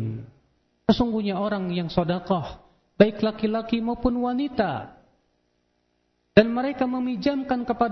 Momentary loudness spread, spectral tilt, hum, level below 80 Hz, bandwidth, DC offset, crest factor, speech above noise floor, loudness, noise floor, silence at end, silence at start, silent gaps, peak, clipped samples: 8 LU; -8 dB/octave; 60 Hz at -50 dBFS; -48 dBFS; 6.2 kHz; under 0.1%; 24 dB; 47 dB; -24 LUFS; -71 dBFS; 0 s; 0 s; none; 0 dBFS; under 0.1%